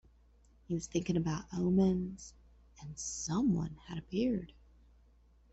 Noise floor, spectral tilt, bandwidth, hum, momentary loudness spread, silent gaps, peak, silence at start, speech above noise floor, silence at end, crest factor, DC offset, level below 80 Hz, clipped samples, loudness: -64 dBFS; -6 dB/octave; 8.2 kHz; none; 19 LU; none; -20 dBFS; 0.7 s; 30 dB; 1 s; 16 dB; under 0.1%; -56 dBFS; under 0.1%; -35 LUFS